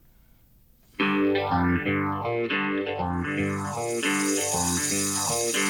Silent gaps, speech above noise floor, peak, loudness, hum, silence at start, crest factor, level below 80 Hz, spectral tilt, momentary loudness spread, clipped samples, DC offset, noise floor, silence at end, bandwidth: none; 31 dB; -12 dBFS; -25 LUFS; none; 1 s; 16 dB; -52 dBFS; -3.5 dB/octave; 5 LU; under 0.1%; under 0.1%; -57 dBFS; 0 s; 19 kHz